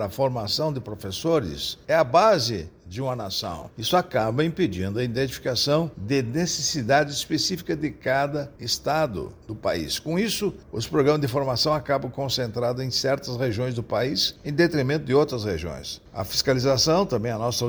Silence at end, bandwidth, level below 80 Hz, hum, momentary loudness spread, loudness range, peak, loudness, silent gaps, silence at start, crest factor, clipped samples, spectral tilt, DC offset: 0 s; over 20 kHz; -50 dBFS; none; 9 LU; 2 LU; -6 dBFS; -24 LUFS; none; 0 s; 18 dB; under 0.1%; -4.5 dB/octave; under 0.1%